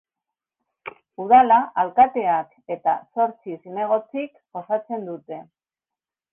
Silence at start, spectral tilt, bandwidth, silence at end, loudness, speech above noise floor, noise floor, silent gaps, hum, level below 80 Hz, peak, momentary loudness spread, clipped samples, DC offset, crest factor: 0.85 s; -8.5 dB/octave; 3.6 kHz; 0.9 s; -21 LUFS; 69 dB; -90 dBFS; none; none; -64 dBFS; -4 dBFS; 22 LU; under 0.1%; under 0.1%; 20 dB